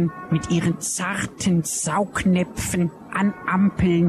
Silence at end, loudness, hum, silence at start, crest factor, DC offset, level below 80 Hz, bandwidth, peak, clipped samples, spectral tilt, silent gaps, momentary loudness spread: 0 s; -22 LUFS; none; 0 s; 14 dB; under 0.1%; -44 dBFS; 13.5 kHz; -8 dBFS; under 0.1%; -5 dB/octave; none; 4 LU